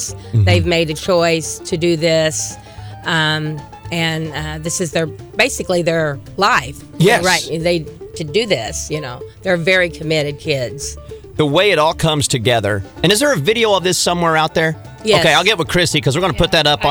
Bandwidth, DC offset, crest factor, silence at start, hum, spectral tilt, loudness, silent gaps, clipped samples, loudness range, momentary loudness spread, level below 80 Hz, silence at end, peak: over 20 kHz; under 0.1%; 16 dB; 0 s; none; -4 dB/octave; -15 LUFS; none; under 0.1%; 4 LU; 12 LU; -38 dBFS; 0 s; 0 dBFS